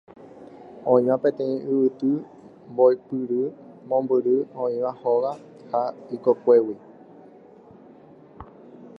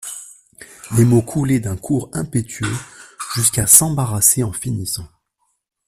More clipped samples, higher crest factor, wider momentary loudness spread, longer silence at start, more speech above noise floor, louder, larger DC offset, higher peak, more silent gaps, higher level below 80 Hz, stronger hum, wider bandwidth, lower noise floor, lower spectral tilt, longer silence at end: neither; about the same, 20 dB vs 18 dB; about the same, 18 LU vs 18 LU; first, 0.2 s vs 0 s; second, 27 dB vs 52 dB; second, -23 LUFS vs -16 LUFS; neither; second, -4 dBFS vs 0 dBFS; neither; second, -66 dBFS vs -46 dBFS; neither; second, 5.2 kHz vs 16 kHz; second, -49 dBFS vs -69 dBFS; first, -9.5 dB/octave vs -4.5 dB/octave; second, 0.1 s vs 0.8 s